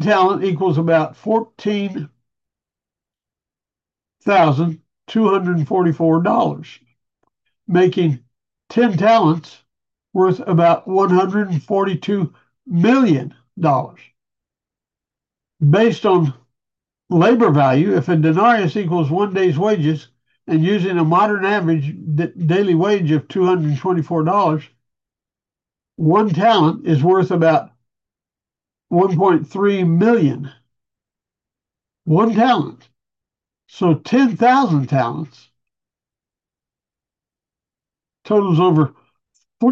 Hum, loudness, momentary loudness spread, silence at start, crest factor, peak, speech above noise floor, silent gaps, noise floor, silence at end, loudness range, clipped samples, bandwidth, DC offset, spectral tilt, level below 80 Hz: none; -16 LUFS; 9 LU; 0 s; 14 dB; -2 dBFS; 74 dB; none; -90 dBFS; 0 s; 5 LU; under 0.1%; 7.2 kHz; under 0.1%; -8 dB/octave; -66 dBFS